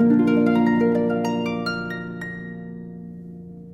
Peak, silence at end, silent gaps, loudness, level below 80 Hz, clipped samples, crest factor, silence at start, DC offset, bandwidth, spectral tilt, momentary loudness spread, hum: -6 dBFS; 0 s; none; -21 LUFS; -56 dBFS; under 0.1%; 16 dB; 0 s; under 0.1%; 7.4 kHz; -7.5 dB/octave; 20 LU; none